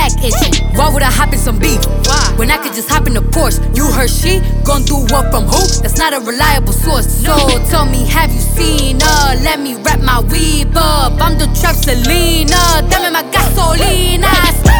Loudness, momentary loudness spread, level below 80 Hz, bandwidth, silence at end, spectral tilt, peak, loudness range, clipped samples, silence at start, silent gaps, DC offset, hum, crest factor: -11 LUFS; 4 LU; -12 dBFS; over 20 kHz; 0 s; -4 dB/octave; 0 dBFS; 1 LU; under 0.1%; 0 s; none; under 0.1%; none; 10 dB